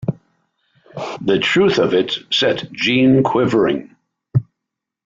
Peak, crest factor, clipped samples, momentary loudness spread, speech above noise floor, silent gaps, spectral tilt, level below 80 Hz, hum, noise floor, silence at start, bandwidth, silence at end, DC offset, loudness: -4 dBFS; 14 dB; under 0.1%; 13 LU; 66 dB; none; -6 dB/octave; -54 dBFS; none; -81 dBFS; 0 s; 7.6 kHz; 0.65 s; under 0.1%; -16 LUFS